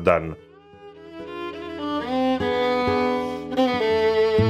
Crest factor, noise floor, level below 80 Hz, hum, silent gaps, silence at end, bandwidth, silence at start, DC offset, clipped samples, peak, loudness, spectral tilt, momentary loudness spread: 20 dB; -45 dBFS; -48 dBFS; none; none; 0 s; 11 kHz; 0 s; under 0.1%; under 0.1%; -2 dBFS; -23 LUFS; -7 dB/octave; 17 LU